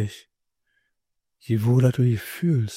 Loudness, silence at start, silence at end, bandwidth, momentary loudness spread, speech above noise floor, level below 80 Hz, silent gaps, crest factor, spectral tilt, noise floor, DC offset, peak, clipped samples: -22 LUFS; 0 s; 0 s; 16 kHz; 8 LU; 59 dB; -60 dBFS; none; 16 dB; -7.5 dB/octave; -81 dBFS; under 0.1%; -8 dBFS; under 0.1%